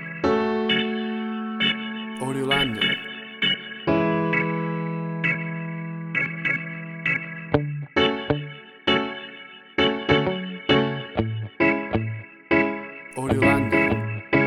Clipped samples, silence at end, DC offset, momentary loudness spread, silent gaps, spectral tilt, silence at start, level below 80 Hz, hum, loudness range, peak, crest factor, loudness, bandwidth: under 0.1%; 0 s; under 0.1%; 10 LU; none; -6 dB/octave; 0 s; -50 dBFS; none; 2 LU; -2 dBFS; 22 dB; -24 LUFS; 13 kHz